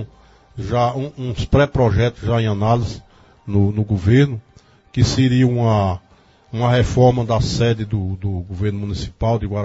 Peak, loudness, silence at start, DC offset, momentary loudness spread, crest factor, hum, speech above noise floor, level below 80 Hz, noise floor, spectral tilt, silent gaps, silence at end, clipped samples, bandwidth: -2 dBFS; -18 LUFS; 0 s; under 0.1%; 13 LU; 16 dB; none; 31 dB; -34 dBFS; -48 dBFS; -7 dB/octave; none; 0 s; under 0.1%; 8 kHz